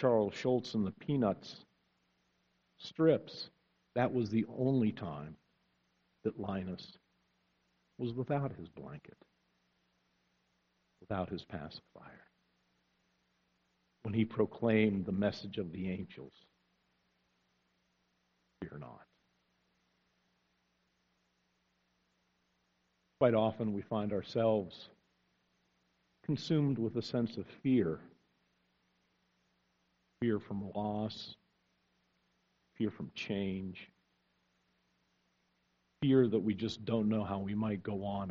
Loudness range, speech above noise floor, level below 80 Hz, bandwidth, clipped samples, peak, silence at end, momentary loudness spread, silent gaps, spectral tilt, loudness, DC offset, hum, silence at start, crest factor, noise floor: 12 LU; 44 dB; -70 dBFS; 7 kHz; under 0.1%; -14 dBFS; 0 s; 18 LU; none; -6.5 dB/octave; -35 LUFS; under 0.1%; 60 Hz at -70 dBFS; 0 s; 24 dB; -78 dBFS